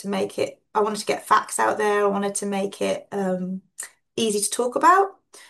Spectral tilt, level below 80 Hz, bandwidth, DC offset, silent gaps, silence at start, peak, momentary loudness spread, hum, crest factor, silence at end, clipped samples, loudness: -3.5 dB/octave; -72 dBFS; 12.5 kHz; under 0.1%; none; 0 s; -4 dBFS; 11 LU; none; 18 dB; 0.1 s; under 0.1%; -23 LUFS